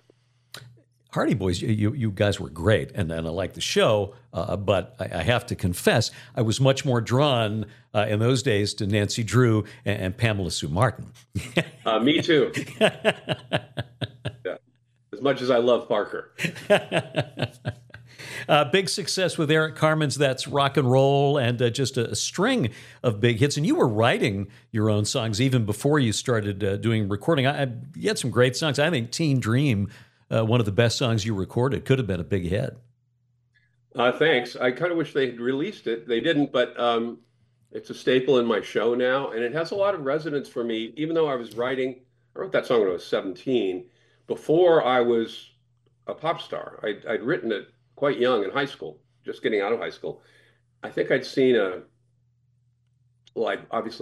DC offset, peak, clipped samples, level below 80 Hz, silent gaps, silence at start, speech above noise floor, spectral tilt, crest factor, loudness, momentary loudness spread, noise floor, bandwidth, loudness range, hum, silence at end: under 0.1%; -4 dBFS; under 0.1%; -56 dBFS; none; 0.55 s; 44 dB; -5.5 dB/octave; 22 dB; -24 LUFS; 12 LU; -68 dBFS; 14.5 kHz; 4 LU; none; 0 s